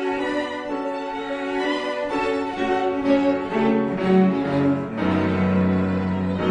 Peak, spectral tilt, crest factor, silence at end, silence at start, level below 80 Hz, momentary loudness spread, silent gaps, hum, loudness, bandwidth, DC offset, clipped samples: -8 dBFS; -7.5 dB/octave; 14 dB; 0 s; 0 s; -52 dBFS; 8 LU; none; none; -22 LUFS; 9.4 kHz; under 0.1%; under 0.1%